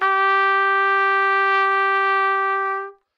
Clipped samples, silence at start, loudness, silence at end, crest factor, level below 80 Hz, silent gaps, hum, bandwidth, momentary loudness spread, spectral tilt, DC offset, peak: under 0.1%; 0 s; -18 LUFS; 0.25 s; 12 dB; under -90 dBFS; none; none; 6.6 kHz; 5 LU; -0.5 dB/octave; under 0.1%; -8 dBFS